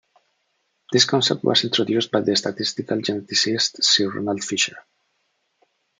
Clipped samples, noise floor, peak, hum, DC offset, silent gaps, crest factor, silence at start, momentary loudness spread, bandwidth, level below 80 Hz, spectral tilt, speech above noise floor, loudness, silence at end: under 0.1%; -71 dBFS; -2 dBFS; none; under 0.1%; none; 22 dB; 0.9 s; 8 LU; 12 kHz; -70 dBFS; -3 dB/octave; 50 dB; -20 LUFS; 1.2 s